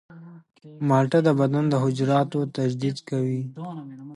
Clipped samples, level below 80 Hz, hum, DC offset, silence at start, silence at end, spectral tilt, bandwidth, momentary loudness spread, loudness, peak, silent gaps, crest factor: under 0.1%; -68 dBFS; none; under 0.1%; 0.1 s; 0 s; -8 dB/octave; 11.5 kHz; 14 LU; -23 LUFS; -6 dBFS; none; 16 dB